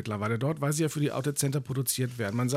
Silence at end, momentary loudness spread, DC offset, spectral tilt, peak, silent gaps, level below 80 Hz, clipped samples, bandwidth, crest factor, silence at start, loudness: 0 s; 2 LU; under 0.1%; -5 dB/octave; -12 dBFS; none; -68 dBFS; under 0.1%; 16 kHz; 16 dB; 0 s; -29 LUFS